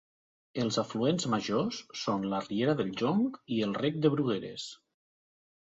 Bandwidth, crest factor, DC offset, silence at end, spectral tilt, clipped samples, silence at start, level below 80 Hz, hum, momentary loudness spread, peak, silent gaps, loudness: 8 kHz; 18 dB; under 0.1%; 1.05 s; -5.5 dB/octave; under 0.1%; 0.55 s; -70 dBFS; none; 7 LU; -12 dBFS; none; -31 LUFS